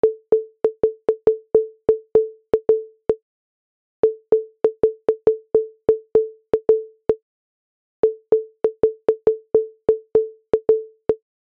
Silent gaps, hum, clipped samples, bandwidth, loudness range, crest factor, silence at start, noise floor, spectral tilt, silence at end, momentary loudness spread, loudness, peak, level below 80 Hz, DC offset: 3.22-4.03 s, 7.22-8.03 s; none; under 0.1%; 3.3 kHz; 1 LU; 16 dB; 0.05 s; under -90 dBFS; -9 dB/octave; 0.35 s; 6 LU; -21 LUFS; -4 dBFS; -54 dBFS; under 0.1%